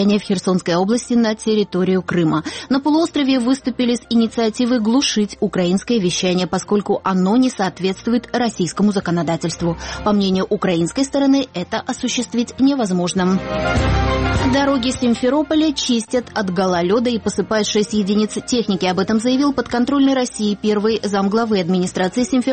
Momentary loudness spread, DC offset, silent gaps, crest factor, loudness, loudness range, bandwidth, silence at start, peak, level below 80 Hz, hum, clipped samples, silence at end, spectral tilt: 4 LU; under 0.1%; none; 14 dB; -18 LUFS; 1 LU; 8.8 kHz; 0 s; -4 dBFS; -36 dBFS; none; under 0.1%; 0 s; -5 dB/octave